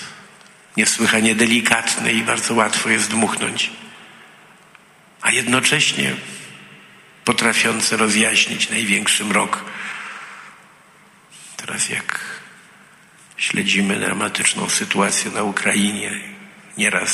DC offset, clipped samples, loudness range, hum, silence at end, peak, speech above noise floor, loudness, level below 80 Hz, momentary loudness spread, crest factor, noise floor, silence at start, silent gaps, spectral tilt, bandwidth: under 0.1%; under 0.1%; 8 LU; none; 0 s; 0 dBFS; 31 dB; -17 LUFS; -62 dBFS; 17 LU; 20 dB; -49 dBFS; 0 s; none; -2 dB/octave; 15 kHz